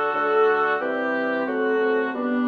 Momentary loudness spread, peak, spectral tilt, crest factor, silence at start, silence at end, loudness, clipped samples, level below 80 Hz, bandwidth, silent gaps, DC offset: 5 LU; -8 dBFS; -6 dB/octave; 12 dB; 0 s; 0 s; -22 LUFS; under 0.1%; -70 dBFS; 5 kHz; none; under 0.1%